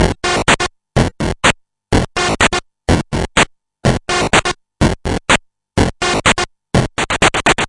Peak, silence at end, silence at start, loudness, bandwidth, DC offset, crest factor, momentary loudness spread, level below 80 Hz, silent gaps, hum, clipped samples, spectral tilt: 0 dBFS; 0 s; 0 s; -15 LUFS; 11.5 kHz; under 0.1%; 16 dB; 5 LU; -28 dBFS; none; none; under 0.1%; -4 dB/octave